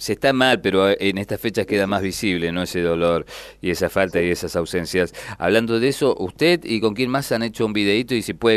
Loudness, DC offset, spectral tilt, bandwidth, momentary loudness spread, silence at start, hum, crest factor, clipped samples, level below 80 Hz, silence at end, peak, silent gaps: -20 LUFS; under 0.1%; -5 dB/octave; 13.5 kHz; 7 LU; 0 s; none; 18 dB; under 0.1%; -48 dBFS; 0 s; -2 dBFS; none